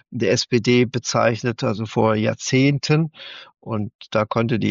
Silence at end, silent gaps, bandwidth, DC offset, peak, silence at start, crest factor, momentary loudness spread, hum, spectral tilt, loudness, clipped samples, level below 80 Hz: 0 s; 3.95-3.99 s; 7.6 kHz; under 0.1%; -4 dBFS; 0.1 s; 16 dB; 10 LU; none; -5.5 dB/octave; -20 LUFS; under 0.1%; -56 dBFS